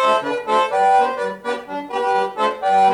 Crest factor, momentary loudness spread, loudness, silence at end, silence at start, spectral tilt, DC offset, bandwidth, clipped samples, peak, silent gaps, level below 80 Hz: 12 dB; 10 LU; -19 LUFS; 0 s; 0 s; -3.5 dB/octave; under 0.1%; 11 kHz; under 0.1%; -6 dBFS; none; -62 dBFS